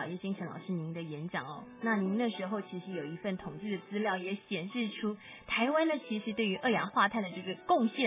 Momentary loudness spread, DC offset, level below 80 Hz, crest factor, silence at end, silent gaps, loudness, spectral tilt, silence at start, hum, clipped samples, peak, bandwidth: 10 LU; under 0.1%; -72 dBFS; 18 dB; 0 s; none; -34 LUFS; -4 dB/octave; 0 s; none; under 0.1%; -16 dBFS; 3.9 kHz